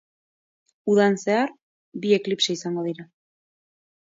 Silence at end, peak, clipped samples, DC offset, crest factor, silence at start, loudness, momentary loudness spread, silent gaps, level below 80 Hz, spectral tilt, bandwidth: 1.1 s; -6 dBFS; under 0.1%; under 0.1%; 18 dB; 0.85 s; -23 LUFS; 13 LU; 1.62-1.92 s; -74 dBFS; -4.5 dB/octave; 7.8 kHz